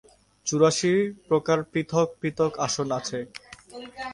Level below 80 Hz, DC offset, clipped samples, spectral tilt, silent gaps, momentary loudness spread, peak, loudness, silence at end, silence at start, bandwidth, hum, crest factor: -62 dBFS; under 0.1%; under 0.1%; -4.5 dB/octave; none; 19 LU; -6 dBFS; -25 LUFS; 0 s; 0.45 s; 11.5 kHz; none; 20 dB